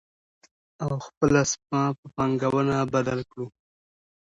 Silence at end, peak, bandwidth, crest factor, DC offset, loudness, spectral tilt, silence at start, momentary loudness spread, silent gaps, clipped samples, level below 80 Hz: 0.75 s; -6 dBFS; 8.2 kHz; 22 dB; under 0.1%; -25 LUFS; -5.5 dB/octave; 0.8 s; 12 LU; 1.17-1.21 s, 1.98-2.03 s; under 0.1%; -54 dBFS